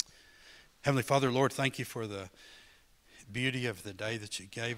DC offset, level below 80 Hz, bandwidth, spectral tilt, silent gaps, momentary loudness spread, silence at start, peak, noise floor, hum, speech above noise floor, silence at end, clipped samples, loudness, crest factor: under 0.1%; -66 dBFS; 16 kHz; -5 dB/octave; none; 14 LU; 0 s; -12 dBFS; -62 dBFS; none; 29 dB; 0 s; under 0.1%; -33 LUFS; 24 dB